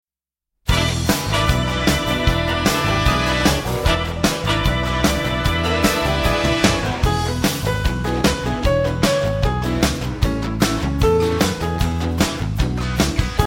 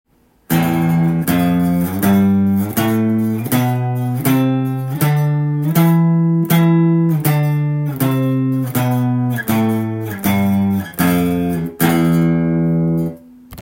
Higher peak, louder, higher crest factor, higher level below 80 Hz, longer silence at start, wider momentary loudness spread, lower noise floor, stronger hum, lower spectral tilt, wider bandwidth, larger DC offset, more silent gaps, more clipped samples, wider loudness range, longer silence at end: about the same, 0 dBFS vs 0 dBFS; second, -19 LUFS vs -16 LUFS; about the same, 18 dB vs 14 dB; first, -26 dBFS vs -50 dBFS; first, 0.65 s vs 0.5 s; about the same, 4 LU vs 6 LU; first, -88 dBFS vs -36 dBFS; neither; second, -4.5 dB/octave vs -7 dB/octave; about the same, 16.5 kHz vs 17 kHz; neither; neither; neither; about the same, 2 LU vs 2 LU; about the same, 0 s vs 0 s